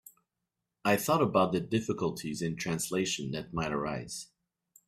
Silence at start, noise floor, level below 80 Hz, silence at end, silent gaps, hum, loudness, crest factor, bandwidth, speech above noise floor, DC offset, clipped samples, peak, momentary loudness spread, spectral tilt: 0.85 s; -86 dBFS; -60 dBFS; 0.65 s; none; none; -31 LUFS; 20 dB; 16 kHz; 56 dB; under 0.1%; under 0.1%; -12 dBFS; 10 LU; -4.5 dB/octave